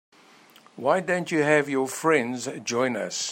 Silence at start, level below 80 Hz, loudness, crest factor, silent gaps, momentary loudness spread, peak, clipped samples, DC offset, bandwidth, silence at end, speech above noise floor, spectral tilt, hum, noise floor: 0.75 s; -74 dBFS; -24 LUFS; 20 dB; none; 8 LU; -6 dBFS; under 0.1%; under 0.1%; 16 kHz; 0 s; 29 dB; -4 dB/octave; none; -54 dBFS